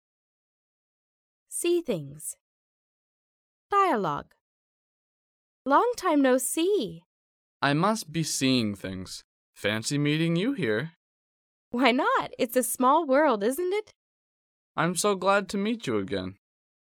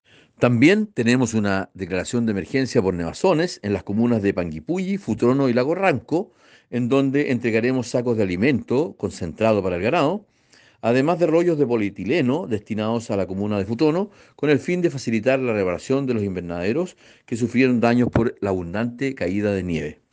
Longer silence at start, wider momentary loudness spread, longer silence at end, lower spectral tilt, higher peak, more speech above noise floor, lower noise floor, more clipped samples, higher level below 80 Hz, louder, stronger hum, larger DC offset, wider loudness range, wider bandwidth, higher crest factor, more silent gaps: first, 1.5 s vs 0.4 s; first, 14 LU vs 8 LU; first, 0.65 s vs 0.2 s; second, -4.5 dB/octave vs -6.5 dB/octave; about the same, -6 dBFS vs -4 dBFS; first, over 64 dB vs 34 dB; first, under -90 dBFS vs -55 dBFS; neither; second, -66 dBFS vs -52 dBFS; second, -26 LUFS vs -21 LUFS; neither; neither; first, 6 LU vs 2 LU; first, 18.5 kHz vs 9.6 kHz; about the same, 22 dB vs 18 dB; first, 2.40-3.70 s, 4.41-5.65 s, 7.06-7.60 s, 9.24-9.53 s, 10.96-11.71 s, 13.95-14.75 s vs none